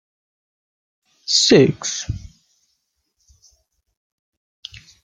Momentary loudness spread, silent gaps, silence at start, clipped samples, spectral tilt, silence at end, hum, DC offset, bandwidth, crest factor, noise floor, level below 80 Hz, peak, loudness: 26 LU; none; 1.3 s; under 0.1%; -3.5 dB/octave; 2.8 s; none; under 0.1%; 9.8 kHz; 22 dB; -71 dBFS; -48 dBFS; -2 dBFS; -16 LUFS